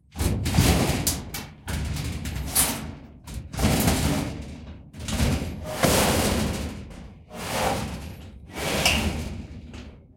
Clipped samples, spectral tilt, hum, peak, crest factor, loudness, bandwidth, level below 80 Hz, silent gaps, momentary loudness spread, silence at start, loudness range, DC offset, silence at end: under 0.1%; -4 dB/octave; none; -6 dBFS; 20 dB; -25 LUFS; 17 kHz; -36 dBFS; none; 19 LU; 0.15 s; 3 LU; under 0.1%; 0.15 s